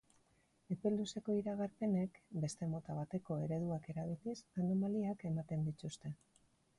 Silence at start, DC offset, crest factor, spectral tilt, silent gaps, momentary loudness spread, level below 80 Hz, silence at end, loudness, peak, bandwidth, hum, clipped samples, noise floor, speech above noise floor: 0.7 s; under 0.1%; 16 dB; -7.5 dB/octave; none; 8 LU; -72 dBFS; 0.65 s; -41 LUFS; -26 dBFS; 11.5 kHz; none; under 0.1%; -75 dBFS; 35 dB